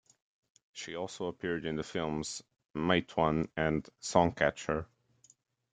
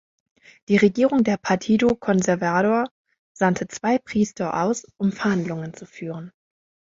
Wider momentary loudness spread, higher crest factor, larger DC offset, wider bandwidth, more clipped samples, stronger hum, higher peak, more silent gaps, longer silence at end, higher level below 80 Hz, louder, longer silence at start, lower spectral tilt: about the same, 14 LU vs 14 LU; first, 26 dB vs 18 dB; neither; first, 9.4 kHz vs 7.8 kHz; neither; neither; second, -10 dBFS vs -4 dBFS; second, none vs 2.91-3.05 s, 3.19-3.35 s; first, 0.85 s vs 0.65 s; about the same, -58 dBFS vs -58 dBFS; second, -33 LUFS vs -22 LUFS; about the same, 0.75 s vs 0.7 s; about the same, -5 dB/octave vs -6 dB/octave